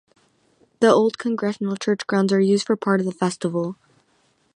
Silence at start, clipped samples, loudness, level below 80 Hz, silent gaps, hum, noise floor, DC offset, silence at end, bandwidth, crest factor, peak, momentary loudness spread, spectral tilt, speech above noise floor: 0.8 s; under 0.1%; -21 LUFS; -70 dBFS; none; none; -64 dBFS; under 0.1%; 0.85 s; 10.5 kHz; 20 dB; -2 dBFS; 8 LU; -6 dB/octave; 43 dB